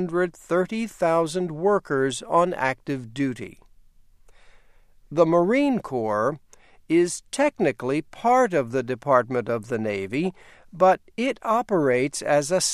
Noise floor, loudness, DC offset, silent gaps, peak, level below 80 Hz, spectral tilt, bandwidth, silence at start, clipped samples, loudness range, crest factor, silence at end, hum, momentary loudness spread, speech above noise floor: -53 dBFS; -23 LUFS; under 0.1%; none; -4 dBFS; -58 dBFS; -5 dB/octave; 14 kHz; 0 s; under 0.1%; 3 LU; 20 dB; 0 s; none; 8 LU; 30 dB